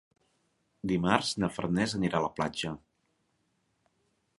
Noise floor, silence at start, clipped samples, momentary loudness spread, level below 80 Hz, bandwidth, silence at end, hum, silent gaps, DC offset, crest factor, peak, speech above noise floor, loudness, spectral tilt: -76 dBFS; 0.85 s; under 0.1%; 11 LU; -58 dBFS; 11.5 kHz; 1.6 s; none; none; under 0.1%; 28 dB; -6 dBFS; 46 dB; -30 LUFS; -5 dB/octave